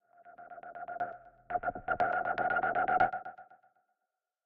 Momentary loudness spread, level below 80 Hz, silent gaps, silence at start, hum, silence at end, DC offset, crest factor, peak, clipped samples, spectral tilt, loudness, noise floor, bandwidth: 20 LU; -64 dBFS; none; 0.25 s; none; 0.9 s; under 0.1%; 20 dB; -14 dBFS; under 0.1%; -3 dB/octave; -33 LUFS; -88 dBFS; 5.4 kHz